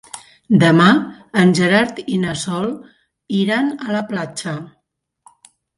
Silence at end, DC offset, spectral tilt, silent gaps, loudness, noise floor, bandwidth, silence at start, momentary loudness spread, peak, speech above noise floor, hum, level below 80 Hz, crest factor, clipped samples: 1.1 s; under 0.1%; -5.5 dB/octave; none; -17 LUFS; -72 dBFS; 11.5 kHz; 0.15 s; 15 LU; 0 dBFS; 56 dB; none; -58 dBFS; 18 dB; under 0.1%